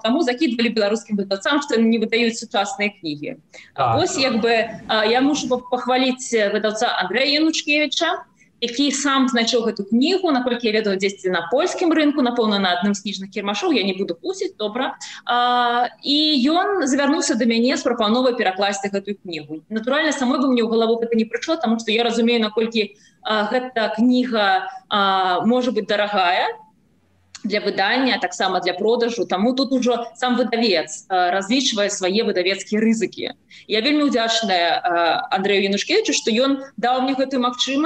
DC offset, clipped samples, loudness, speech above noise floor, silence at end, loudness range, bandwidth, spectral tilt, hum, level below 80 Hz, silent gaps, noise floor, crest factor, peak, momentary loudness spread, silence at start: under 0.1%; under 0.1%; -19 LUFS; 40 dB; 0 s; 2 LU; 9.2 kHz; -3.5 dB/octave; none; -64 dBFS; none; -60 dBFS; 14 dB; -6 dBFS; 7 LU; 0.05 s